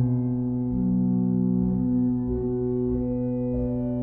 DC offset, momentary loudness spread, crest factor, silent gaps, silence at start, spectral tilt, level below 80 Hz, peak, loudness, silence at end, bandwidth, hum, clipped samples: 0.2%; 4 LU; 10 dB; none; 0 s; -15 dB/octave; -40 dBFS; -14 dBFS; -25 LUFS; 0 s; 2.1 kHz; none; under 0.1%